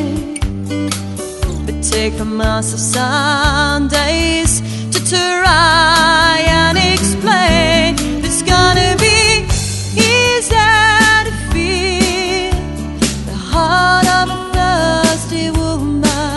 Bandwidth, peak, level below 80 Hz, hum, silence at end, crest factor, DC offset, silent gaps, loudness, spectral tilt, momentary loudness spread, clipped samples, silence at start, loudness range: 12 kHz; 0 dBFS; -24 dBFS; none; 0 s; 14 dB; under 0.1%; none; -12 LUFS; -3.5 dB/octave; 10 LU; under 0.1%; 0 s; 4 LU